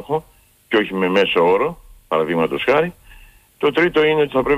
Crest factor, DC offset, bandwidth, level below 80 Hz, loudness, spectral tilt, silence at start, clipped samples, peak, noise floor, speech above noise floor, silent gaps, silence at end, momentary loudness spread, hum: 12 dB; under 0.1%; 15 kHz; -48 dBFS; -18 LUFS; -6 dB/octave; 0 s; under 0.1%; -6 dBFS; -46 dBFS; 29 dB; none; 0 s; 9 LU; none